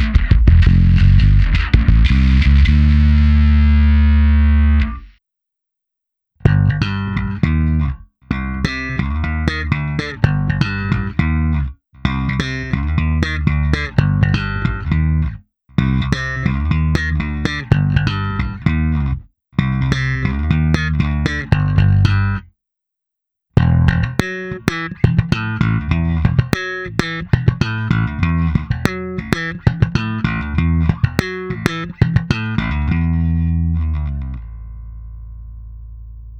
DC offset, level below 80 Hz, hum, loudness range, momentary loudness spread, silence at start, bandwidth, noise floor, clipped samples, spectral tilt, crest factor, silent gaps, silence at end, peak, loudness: under 0.1%; -20 dBFS; none; 7 LU; 11 LU; 0 s; 8.2 kHz; -81 dBFS; under 0.1%; -7.5 dB/octave; 16 dB; none; 0 s; 0 dBFS; -17 LUFS